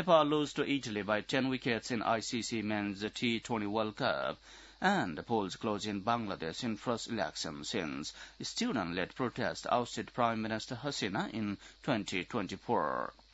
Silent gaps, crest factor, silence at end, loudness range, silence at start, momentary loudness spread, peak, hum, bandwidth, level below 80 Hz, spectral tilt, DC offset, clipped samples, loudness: none; 22 dB; 0.2 s; 3 LU; 0 s; 7 LU; -12 dBFS; none; 8 kHz; -64 dBFS; -3.5 dB/octave; under 0.1%; under 0.1%; -35 LUFS